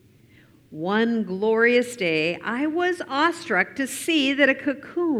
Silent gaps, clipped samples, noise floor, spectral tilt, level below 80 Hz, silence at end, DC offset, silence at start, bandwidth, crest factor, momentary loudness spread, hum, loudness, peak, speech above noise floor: none; under 0.1%; -54 dBFS; -4 dB/octave; -68 dBFS; 0 s; under 0.1%; 0.7 s; 15.5 kHz; 18 dB; 8 LU; none; -22 LUFS; -6 dBFS; 31 dB